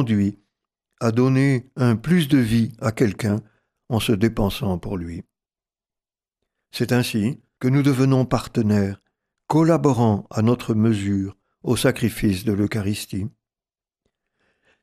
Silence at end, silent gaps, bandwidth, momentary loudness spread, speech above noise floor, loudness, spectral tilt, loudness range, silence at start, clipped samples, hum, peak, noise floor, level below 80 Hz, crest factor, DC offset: 1.55 s; none; 15 kHz; 10 LU; over 70 dB; -21 LUFS; -6.5 dB/octave; 6 LU; 0 s; under 0.1%; none; -6 dBFS; under -90 dBFS; -46 dBFS; 16 dB; under 0.1%